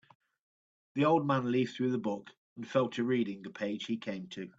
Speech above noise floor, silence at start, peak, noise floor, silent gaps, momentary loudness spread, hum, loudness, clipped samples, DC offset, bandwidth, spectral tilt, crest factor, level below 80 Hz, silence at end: over 58 dB; 0.95 s; -14 dBFS; under -90 dBFS; 2.37-2.56 s; 13 LU; none; -33 LUFS; under 0.1%; under 0.1%; 7.8 kHz; -7 dB/octave; 18 dB; -78 dBFS; 0.1 s